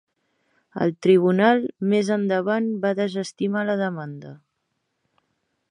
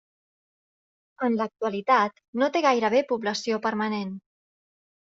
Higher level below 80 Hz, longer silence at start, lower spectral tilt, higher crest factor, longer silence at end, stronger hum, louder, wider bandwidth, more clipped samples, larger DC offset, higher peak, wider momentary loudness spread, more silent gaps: about the same, -72 dBFS vs -74 dBFS; second, 0.75 s vs 1.2 s; first, -6.5 dB/octave vs -3 dB/octave; about the same, 20 dB vs 20 dB; first, 1.35 s vs 1 s; neither; first, -22 LUFS vs -25 LUFS; first, 10.5 kHz vs 7.6 kHz; neither; neither; about the same, -4 dBFS vs -6 dBFS; first, 12 LU vs 8 LU; second, none vs 2.28-2.33 s